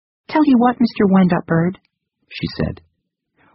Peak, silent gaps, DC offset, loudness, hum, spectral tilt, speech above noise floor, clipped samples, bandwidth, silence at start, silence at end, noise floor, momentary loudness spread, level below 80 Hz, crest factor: -2 dBFS; none; under 0.1%; -17 LUFS; none; -6.5 dB/octave; 56 dB; under 0.1%; 5.8 kHz; 0.3 s; 0.8 s; -72 dBFS; 14 LU; -44 dBFS; 16 dB